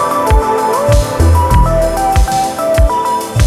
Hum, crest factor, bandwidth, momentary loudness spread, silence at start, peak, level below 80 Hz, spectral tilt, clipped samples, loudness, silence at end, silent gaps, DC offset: none; 10 dB; 15.5 kHz; 4 LU; 0 s; 0 dBFS; -16 dBFS; -5.5 dB/octave; under 0.1%; -12 LUFS; 0 s; none; under 0.1%